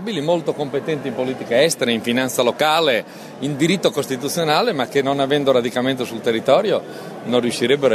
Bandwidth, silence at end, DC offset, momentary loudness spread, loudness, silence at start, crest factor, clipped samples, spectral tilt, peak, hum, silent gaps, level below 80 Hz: 13.5 kHz; 0 s; under 0.1%; 7 LU; -19 LUFS; 0 s; 16 dB; under 0.1%; -4.5 dB/octave; -2 dBFS; none; none; -64 dBFS